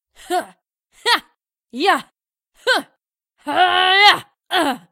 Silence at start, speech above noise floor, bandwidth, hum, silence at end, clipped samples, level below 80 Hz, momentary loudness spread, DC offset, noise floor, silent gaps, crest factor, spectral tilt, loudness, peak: 0.3 s; 49 dB; 16 kHz; none; 0.15 s; under 0.1%; -64 dBFS; 13 LU; under 0.1%; -65 dBFS; none; 20 dB; -1 dB/octave; -17 LUFS; 0 dBFS